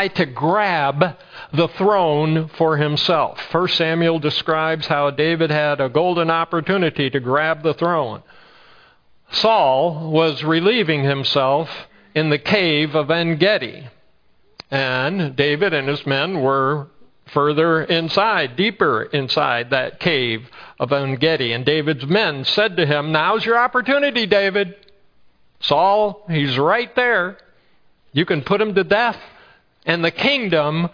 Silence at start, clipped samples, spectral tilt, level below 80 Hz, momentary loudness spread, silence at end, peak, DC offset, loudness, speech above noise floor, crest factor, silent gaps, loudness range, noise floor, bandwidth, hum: 0 s; under 0.1%; -6.5 dB/octave; -58 dBFS; 6 LU; 0.05 s; 0 dBFS; under 0.1%; -18 LUFS; 38 dB; 18 dB; none; 2 LU; -56 dBFS; 5.4 kHz; none